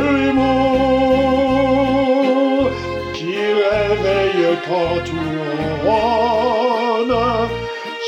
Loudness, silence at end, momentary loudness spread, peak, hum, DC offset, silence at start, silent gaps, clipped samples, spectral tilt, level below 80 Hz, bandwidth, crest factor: -17 LUFS; 0 s; 7 LU; -4 dBFS; none; under 0.1%; 0 s; none; under 0.1%; -6.5 dB/octave; -38 dBFS; 9.2 kHz; 14 dB